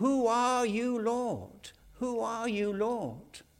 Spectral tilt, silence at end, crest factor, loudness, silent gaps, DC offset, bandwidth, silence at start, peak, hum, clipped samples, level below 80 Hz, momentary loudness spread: -5 dB/octave; 0.2 s; 14 dB; -31 LUFS; none; under 0.1%; 16 kHz; 0 s; -16 dBFS; none; under 0.1%; -64 dBFS; 20 LU